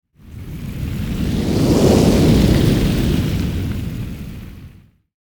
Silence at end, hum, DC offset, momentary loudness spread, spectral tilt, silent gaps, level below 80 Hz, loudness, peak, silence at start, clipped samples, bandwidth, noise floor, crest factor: 0.6 s; none; under 0.1%; 20 LU; -6.5 dB/octave; none; -26 dBFS; -17 LUFS; 0 dBFS; 0.25 s; under 0.1%; over 20 kHz; -44 dBFS; 16 dB